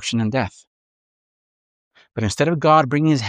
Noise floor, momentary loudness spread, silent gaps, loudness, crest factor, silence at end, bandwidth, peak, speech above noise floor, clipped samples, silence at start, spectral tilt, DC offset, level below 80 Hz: under -90 dBFS; 13 LU; 0.67-1.91 s; -19 LUFS; 18 dB; 0 s; 11.5 kHz; -2 dBFS; over 72 dB; under 0.1%; 0 s; -6 dB/octave; under 0.1%; -52 dBFS